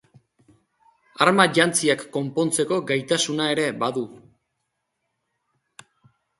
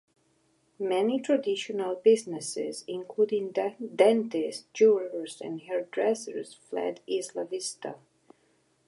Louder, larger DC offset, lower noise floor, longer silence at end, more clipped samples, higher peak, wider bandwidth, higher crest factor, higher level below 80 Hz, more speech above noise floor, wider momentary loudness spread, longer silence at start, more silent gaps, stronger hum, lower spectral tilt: first, -21 LUFS vs -28 LUFS; neither; first, -77 dBFS vs -69 dBFS; first, 2.2 s vs 0.9 s; neither; first, 0 dBFS vs -8 dBFS; about the same, 12 kHz vs 11.5 kHz; about the same, 24 dB vs 20 dB; first, -68 dBFS vs -86 dBFS; first, 56 dB vs 41 dB; second, 9 LU vs 14 LU; first, 1.2 s vs 0.8 s; neither; neither; about the same, -3.5 dB/octave vs -4 dB/octave